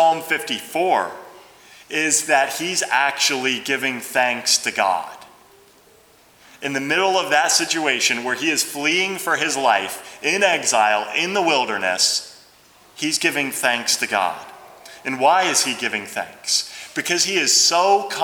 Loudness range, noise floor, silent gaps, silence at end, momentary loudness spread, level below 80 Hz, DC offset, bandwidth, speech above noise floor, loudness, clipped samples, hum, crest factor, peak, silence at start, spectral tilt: 3 LU; -52 dBFS; none; 0 s; 10 LU; -70 dBFS; under 0.1%; over 20 kHz; 32 dB; -19 LUFS; under 0.1%; none; 20 dB; -2 dBFS; 0 s; -1 dB/octave